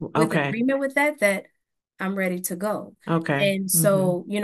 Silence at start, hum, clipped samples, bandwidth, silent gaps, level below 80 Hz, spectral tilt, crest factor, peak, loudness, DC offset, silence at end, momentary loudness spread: 0 s; none; under 0.1%; 13 kHz; none; -68 dBFS; -4.5 dB/octave; 20 dB; -4 dBFS; -23 LUFS; under 0.1%; 0 s; 9 LU